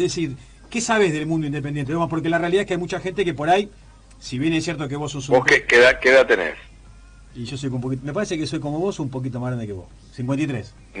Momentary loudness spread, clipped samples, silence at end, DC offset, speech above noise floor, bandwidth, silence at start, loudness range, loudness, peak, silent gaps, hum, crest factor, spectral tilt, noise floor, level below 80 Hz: 18 LU; under 0.1%; 0 s; under 0.1%; 24 dB; 10 kHz; 0 s; 9 LU; -20 LUFS; -4 dBFS; none; none; 16 dB; -5 dB/octave; -45 dBFS; -48 dBFS